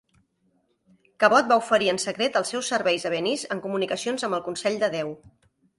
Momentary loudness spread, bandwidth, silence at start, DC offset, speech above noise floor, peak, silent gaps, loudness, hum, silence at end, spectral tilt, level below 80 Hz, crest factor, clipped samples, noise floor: 9 LU; 11.5 kHz; 1.2 s; under 0.1%; 45 dB; -4 dBFS; none; -24 LUFS; none; 0.6 s; -3 dB/octave; -68 dBFS; 20 dB; under 0.1%; -69 dBFS